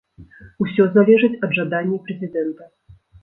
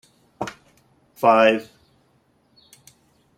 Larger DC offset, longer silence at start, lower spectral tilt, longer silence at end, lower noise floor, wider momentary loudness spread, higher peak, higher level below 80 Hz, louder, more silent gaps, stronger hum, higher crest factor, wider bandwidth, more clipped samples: neither; second, 0.2 s vs 0.4 s; first, -10.5 dB/octave vs -5 dB/octave; second, 0.6 s vs 1.75 s; second, -44 dBFS vs -62 dBFS; second, 13 LU vs 18 LU; about the same, -2 dBFS vs -2 dBFS; first, -56 dBFS vs -66 dBFS; about the same, -18 LUFS vs -20 LUFS; neither; neither; about the same, 18 dB vs 22 dB; second, 4 kHz vs 15.5 kHz; neither